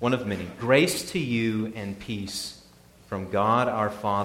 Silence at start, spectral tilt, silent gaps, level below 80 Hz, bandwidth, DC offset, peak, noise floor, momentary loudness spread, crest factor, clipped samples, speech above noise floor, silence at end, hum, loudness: 0 s; -5 dB/octave; none; -56 dBFS; 17 kHz; under 0.1%; -6 dBFS; -53 dBFS; 13 LU; 20 dB; under 0.1%; 28 dB; 0 s; none; -26 LUFS